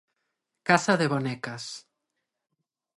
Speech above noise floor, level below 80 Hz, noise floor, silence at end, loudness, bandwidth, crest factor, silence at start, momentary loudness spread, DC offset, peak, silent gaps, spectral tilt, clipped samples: 57 dB; -74 dBFS; -83 dBFS; 1.15 s; -26 LUFS; 11.5 kHz; 26 dB; 0.65 s; 16 LU; under 0.1%; -4 dBFS; none; -5 dB/octave; under 0.1%